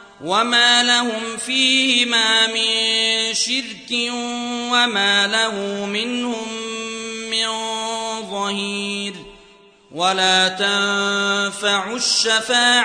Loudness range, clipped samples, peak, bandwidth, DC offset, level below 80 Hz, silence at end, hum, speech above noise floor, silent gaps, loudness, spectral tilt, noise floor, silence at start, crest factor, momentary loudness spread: 8 LU; under 0.1%; -4 dBFS; 10.5 kHz; under 0.1%; -64 dBFS; 0 s; none; 30 dB; none; -17 LUFS; -1 dB/octave; -49 dBFS; 0 s; 16 dB; 11 LU